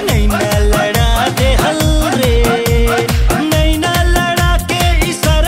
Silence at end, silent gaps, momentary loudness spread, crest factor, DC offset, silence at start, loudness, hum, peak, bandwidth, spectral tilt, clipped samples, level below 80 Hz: 0 s; none; 1 LU; 10 dB; under 0.1%; 0 s; -13 LUFS; none; 0 dBFS; 16.5 kHz; -4.5 dB/octave; under 0.1%; -16 dBFS